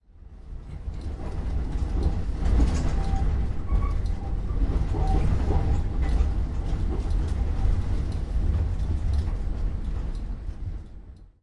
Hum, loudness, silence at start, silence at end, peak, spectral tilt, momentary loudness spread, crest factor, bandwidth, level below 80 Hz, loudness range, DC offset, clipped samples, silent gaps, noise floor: none; -29 LUFS; 0.15 s; 0.15 s; -10 dBFS; -8 dB/octave; 11 LU; 14 dB; 10 kHz; -26 dBFS; 2 LU; under 0.1%; under 0.1%; none; -44 dBFS